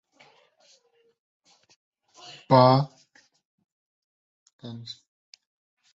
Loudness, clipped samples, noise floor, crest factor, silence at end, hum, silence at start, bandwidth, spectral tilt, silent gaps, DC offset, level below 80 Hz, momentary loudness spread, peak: -20 LUFS; under 0.1%; -64 dBFS; 24 dB; 1 s; none; 2.5 s; 7.6 kHz; -7.5 dB/octave; 3.45-3.58 s, 3.72-4.46 s, 4.53-4.59 s; under 0.1%; -68 dBFS; 28 LU; -4 dBFS